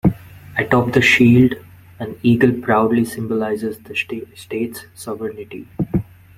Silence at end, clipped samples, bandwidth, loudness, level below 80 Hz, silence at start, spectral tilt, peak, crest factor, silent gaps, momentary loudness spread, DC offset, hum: 0.35 s; under 0.1%; 15.5 kHz; -17 LUFS; -44 dBFS; 0.05 s; -6.5 dB/octave; 0 dBFS; 18 dB; none; 19 LU; under 0.1%; none